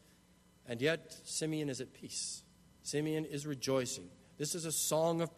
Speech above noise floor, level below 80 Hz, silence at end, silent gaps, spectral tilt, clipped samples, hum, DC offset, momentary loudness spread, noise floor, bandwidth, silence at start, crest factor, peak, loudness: 29 dB; -72 dBFS; 0.05 s; none; -3.5 dB/octave; under 0.1%; none; under 0.1%; 12 LU; -66 dBFS; 13.5 kHz; 0.65 s; 20 dB; -18 dBFS; -37 LUFS